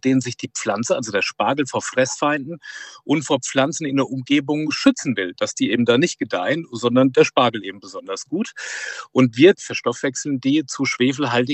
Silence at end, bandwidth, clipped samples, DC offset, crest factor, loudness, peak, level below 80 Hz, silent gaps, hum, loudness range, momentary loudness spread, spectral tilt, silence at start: 0 s; 8.6 kHz; under 0.1%; under 0.1%; 18 dB; -20 LUFS; -2 dBFS; -68 dBFS; none; none; 3 LU; 12 LU; -4.5 dB/octave; 0.05 s